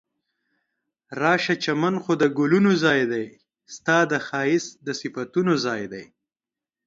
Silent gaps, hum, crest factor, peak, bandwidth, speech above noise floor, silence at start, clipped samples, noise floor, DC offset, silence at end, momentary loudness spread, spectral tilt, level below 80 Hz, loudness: none; none; 18 dB; -6 dBFS; 7.8 kHz; over 68 dB; 1.1 s; under 0.1%; under -90 dBFS; under 0.1%; 0.85 s; 12 LU; -5.5 dB/octave; -70 dBFS; -22 LUFS